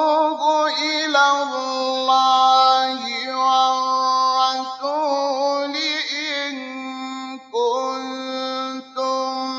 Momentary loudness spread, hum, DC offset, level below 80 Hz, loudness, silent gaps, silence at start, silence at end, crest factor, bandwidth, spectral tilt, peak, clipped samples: 12 LU; none; under 0.1%; -86 dBFS; -19 LUFS; none; 0 s; 0 s; 16 dB; 7.8 kHz; -0.5 dB/octave; -4 dBFS; under 0.1%